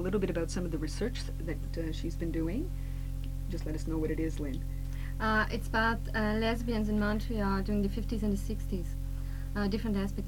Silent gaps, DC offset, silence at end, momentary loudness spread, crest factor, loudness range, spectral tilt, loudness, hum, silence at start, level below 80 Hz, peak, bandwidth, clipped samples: none; 0.4%; 0 s; 9 LU; 16 dB; 5 LU; -6.5 dB/octave; -34 LUFS; none; 0 s; -36 dBFS; -16 dBFS; 16.5 kHz; under 0.1%